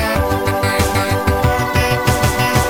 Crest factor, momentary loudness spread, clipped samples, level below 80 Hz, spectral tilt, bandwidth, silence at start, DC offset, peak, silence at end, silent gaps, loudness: 14 dB; 2 LU; under 0.1%; -26 dBFS; -5 dB/octave; 17 kHz; 0 s; 0.8%; -2 dBFS; 0 s; none; -16 LUFS